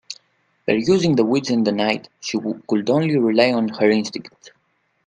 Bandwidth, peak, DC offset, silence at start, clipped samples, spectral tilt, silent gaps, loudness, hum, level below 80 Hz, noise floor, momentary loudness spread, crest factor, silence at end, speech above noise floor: 9.4 kHz; 0 dBFS; under 0.1%; 0.1 s; under 0.1%; -5.5 dB/octave; none; -19 LUFS; none; -62 dBFS; -67 dBFS; 13 LU; 20 dB; 0.8 s; 48 dB